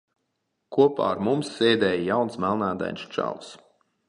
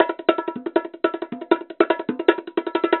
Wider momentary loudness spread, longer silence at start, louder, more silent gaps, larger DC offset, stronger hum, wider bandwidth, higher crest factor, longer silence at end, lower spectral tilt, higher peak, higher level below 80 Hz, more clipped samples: first, 10 LU vs 5 LU; first, 0.7 s vs 0 s; about the same, -24 LUFS vs -23 LUFS; neither; neither; neither; first, 10.5 kHz vs 4.3 kHz; about the same, 20 dB vs 22 dB; first, 0.5 s vs 0 s; second, -6 dB/octave vs -7.5 dB/octave; second, -6 dBFS vs 0 dBFS; first, -60 dBFS vs -74 dBFS; neither